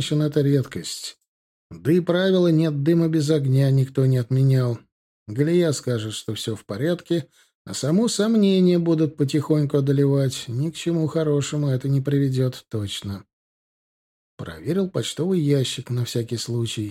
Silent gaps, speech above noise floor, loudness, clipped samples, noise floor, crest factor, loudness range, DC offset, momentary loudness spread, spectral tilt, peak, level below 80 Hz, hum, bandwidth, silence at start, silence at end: 1.28-1.70 s, 4.92-5.26 s, 7.55-7.65 s, 13.33-14.38 s; over 69 dB; -22 LUFS; under 0.1%; under -90 dBFS; 14 dB; 6 LU; under 0.1%; 11 LU; -6.5 dB/octave; -6 dBFS; -62 dBFS; none; 14.5 kHz; 0 s; 0 s